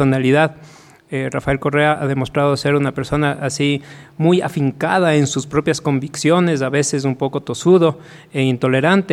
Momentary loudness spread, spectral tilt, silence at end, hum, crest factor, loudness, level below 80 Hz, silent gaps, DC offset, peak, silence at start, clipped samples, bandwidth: 7 LU; -5.5 dB/octave; 0 s; none; 16 dB; -17 LUFS; -46 dBFS; none; under 0.1%; -2 dBFS; 0 s; under 0.1%; 13 kHz